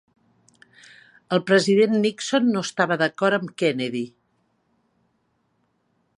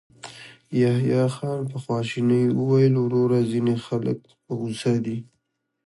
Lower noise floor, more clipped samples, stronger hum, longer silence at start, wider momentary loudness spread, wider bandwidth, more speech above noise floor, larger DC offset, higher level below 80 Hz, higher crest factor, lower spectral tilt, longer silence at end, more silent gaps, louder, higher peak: second, -69 dBFS vs -75 dBFS; neither; neither; first, 1.3 s vs 0.25 s; second, 9 LU vs 14 LU; about the same, 11.5 kHz vs 11.5 kHz; second, 49 dB vs 53 dB; neither; second, -74 dBFS vs -62 dBFS; about the same, 20 dB vs 16 dB; second, -5 dB/octave vs -8 dB/octave; first, 2.1 s vs 0.65 s; neither; about the same, -21 LUFS vs -23 LUFS; first, -4 dBFS vs -8 dBFS